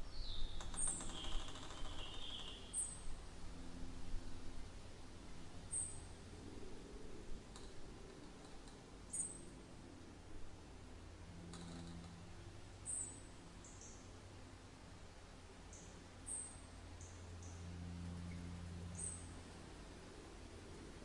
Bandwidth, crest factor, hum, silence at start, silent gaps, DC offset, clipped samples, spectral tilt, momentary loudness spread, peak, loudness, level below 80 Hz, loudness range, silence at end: 11.5 kHz; 22 dB; none; 0 s; none; under 0.1%; under 0.1%; -3 dB/octave; 14 LU; -28 dBFS; -51 LUFS; -54 dBFS; 5 LU; 0 s